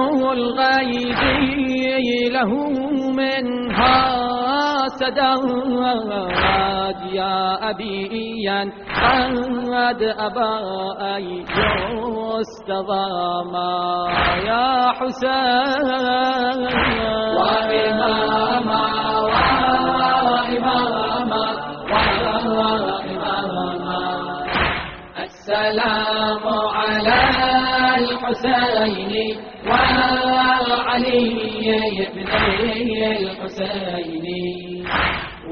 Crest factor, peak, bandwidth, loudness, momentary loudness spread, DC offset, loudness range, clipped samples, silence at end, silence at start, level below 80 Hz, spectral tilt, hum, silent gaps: 18 dB; -2 dBFS; 6.6 kHz; -19 LUFS; 8 LU; under 0.1%; 4 LU; under 0.1%; 0 s; 0 s; -40 dBFS; -2 dB/octave; none; none